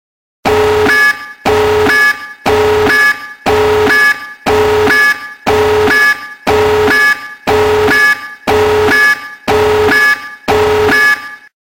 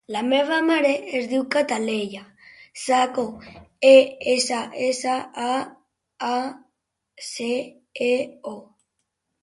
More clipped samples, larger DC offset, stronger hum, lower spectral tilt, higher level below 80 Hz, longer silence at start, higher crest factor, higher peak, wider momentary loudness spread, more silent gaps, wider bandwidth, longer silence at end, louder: neither; neither; neither; about the same, -4 dB/octave vs -3 dB/octave; first, -36 dBFS vs -66 dBFS; first, 0.45 s vs 0.1 s; second, 10 dB vs 20 dB; about the same, 0 dBFS vs -2 dBFS; second, 8 LU vs 19 LU; neither; first, 17 kHz vs 11.5 kHz; second, 0.35 s vs 0.8 s; first, -10 LUFS vs -22 LUFS